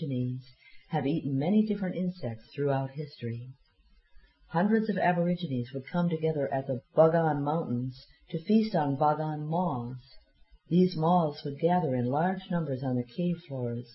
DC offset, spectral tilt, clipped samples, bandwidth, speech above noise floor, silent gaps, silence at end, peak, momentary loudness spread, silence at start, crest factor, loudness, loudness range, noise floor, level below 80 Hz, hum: under 0.1%; -11.5 dB/octave; under 0.1%; 5.8 kHz; 35 dB; none; 0 s; -10 dBFS; 12 LU; 0 s; 18 dB; -29 LUFS; 4 LU; -63 dBFS; -62 dBFS; none